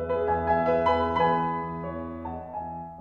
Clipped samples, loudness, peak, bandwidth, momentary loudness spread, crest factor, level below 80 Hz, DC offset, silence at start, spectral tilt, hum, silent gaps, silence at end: under 0.1%; -27 LUFS; -10 dBFS; 6.6 kHz; 12 LU; 16 dB; -48 dBFS; under 0.1%; 0 s; -8 dB/octave; none; none; 0 s